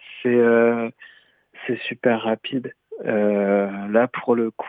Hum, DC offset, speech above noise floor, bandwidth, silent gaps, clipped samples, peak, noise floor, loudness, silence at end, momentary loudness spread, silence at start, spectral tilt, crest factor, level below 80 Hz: none; under 0.1%; 28 dB; 4 kHz; none; under 0.1%; -4 dBFS; -49 dBFS; -21 LUFS; 0 s; 13 LU; 0.05 s; -9 dB/octave; 18 dB; -82 dBFS